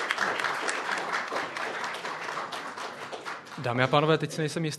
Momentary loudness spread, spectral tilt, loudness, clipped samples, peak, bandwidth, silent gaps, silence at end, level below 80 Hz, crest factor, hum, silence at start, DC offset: 13 LU; -4.5 dB/octave; -30 LUFS; under 0.1%; -6 dBFS; 13 kHz; none; 0 s; -72 dBFS; 24 dB; none; 0 s; under 0.1%